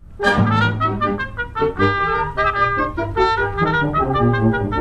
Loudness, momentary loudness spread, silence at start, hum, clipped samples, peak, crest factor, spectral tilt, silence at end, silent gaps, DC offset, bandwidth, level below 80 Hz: -18 LUFS; 5 LU; 0 s; none; under 0.1%; -4 dBFS; 14 dB; -7 dB/octave; 0 s; none; 0.6%; 10 kHz; -34 dBFS